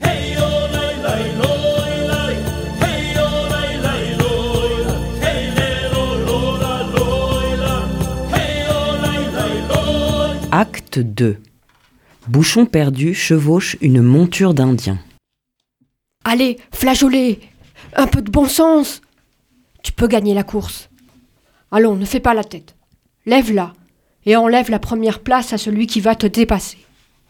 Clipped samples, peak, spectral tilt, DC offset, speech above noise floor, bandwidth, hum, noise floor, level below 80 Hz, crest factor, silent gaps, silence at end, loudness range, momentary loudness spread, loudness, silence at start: under 0.1%; 0 dBFS; -5.5 dB/octave; under 0.1%; 61 dB; 19.5 kHz; none; -75 dBFS; -30 dBFS; 16 dB; none; 0.55 s; 4 LU; 9 LU; -16 LUFS; 0 s